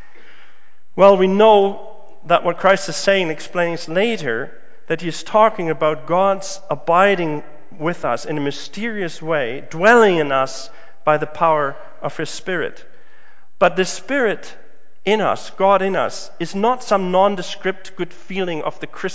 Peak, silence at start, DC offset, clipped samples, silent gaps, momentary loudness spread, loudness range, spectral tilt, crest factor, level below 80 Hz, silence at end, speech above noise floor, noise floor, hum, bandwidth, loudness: 0 dBFS; 0.95 s; 4%; under 0.1%; none; 14 LU; 5 LU; -5 dB/octave; 18 dB; -66 dBFS; 0 s; 38 dB; -55 dBFS; none; 8 kHz; -18 LUFS